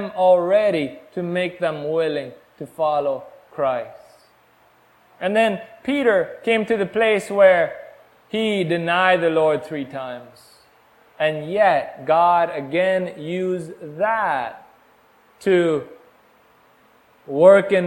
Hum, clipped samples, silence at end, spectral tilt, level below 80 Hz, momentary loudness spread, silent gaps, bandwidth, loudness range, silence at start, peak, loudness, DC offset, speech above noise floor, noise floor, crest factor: none; under 0.1%; 0 s; -6 dB/octave; -64 dBFS; 14 LU; none; 16.5 kHz; 6 LU; 0 s; 0 dBFS; -20 LUFS; under 0.1%; 37 dB; -56 dBFS; 20 dB